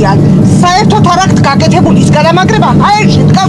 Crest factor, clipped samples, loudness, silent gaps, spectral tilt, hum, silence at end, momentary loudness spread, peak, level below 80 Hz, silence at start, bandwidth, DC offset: 6 dB; 1%; -6 LUFS; none; -6 dB/octave; none; 0 s; 1 LU; 0 dBFS; -28 dBFS; 0 s; 11.5 kHz; under 0.1%